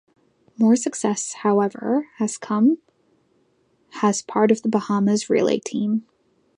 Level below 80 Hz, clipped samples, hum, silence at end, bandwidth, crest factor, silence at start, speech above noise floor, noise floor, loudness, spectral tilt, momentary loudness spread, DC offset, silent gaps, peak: -72 dBFS; under 0.1%; none; 0.55 s; 10.5 kHz; 18 dB; 0.6 s; 44 dB; -64 dBFS; -21 LUFS; -5.5 dB/octave; 7 LU; under 0.1%; none; -4 dBFS